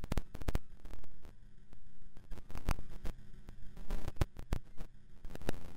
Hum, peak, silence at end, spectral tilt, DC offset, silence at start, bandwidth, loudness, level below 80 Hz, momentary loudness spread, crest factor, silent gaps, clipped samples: none; -22 dBFS; 0 s; -6 dB/octave; under 0.1%; 0 s; 15.5 kHz; -45 LUFS; -42 dBFS; 21 LU; 12 dB; none; under 0.1%